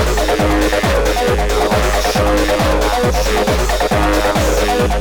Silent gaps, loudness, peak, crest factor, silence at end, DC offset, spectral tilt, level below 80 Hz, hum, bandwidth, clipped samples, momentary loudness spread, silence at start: none; -14 LUFS; -2 dBFS; 12 dB; 0 s; under 0.1%; -4.5 dB/octave; -20 dBFS; none; 19 kHz; under 0.1%; 1 LU; 0 s